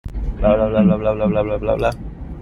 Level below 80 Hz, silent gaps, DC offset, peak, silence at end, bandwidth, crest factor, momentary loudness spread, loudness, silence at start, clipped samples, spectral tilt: -28 dBFS; none; under 0.1%; -2 dBFS; 0 s; 12 kHz; 16 dB; 13 LU; -18 LUFS; 0.05 s; under 0.1%; -9 dB/octave